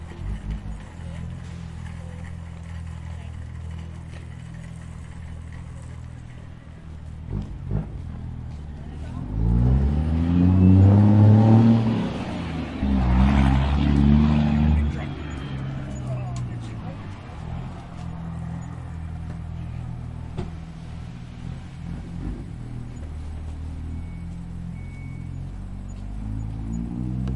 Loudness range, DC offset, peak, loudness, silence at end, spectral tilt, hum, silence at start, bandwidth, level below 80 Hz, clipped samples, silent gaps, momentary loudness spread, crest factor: 19 LU; under 0.1%; -4 dBFS; -23 LUFS; 0 s; -9 dB/octave; none; 0 s; 9 kHz; -32 dBFS; under 0.1%; none; 20 LU; 20 dB